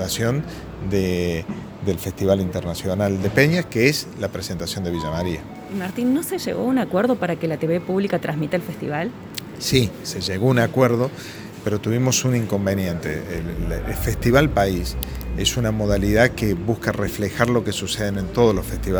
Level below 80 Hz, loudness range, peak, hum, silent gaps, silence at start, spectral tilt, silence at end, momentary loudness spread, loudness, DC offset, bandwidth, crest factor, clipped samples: -36 dBFS; 3 LU; 0 dBFS; none; none; 0 s; -5.5 dB/octave; 0 s; 10 LU; -22 LUFS; under 0.1%; over 20 kHz; 22 dB; under 0.1%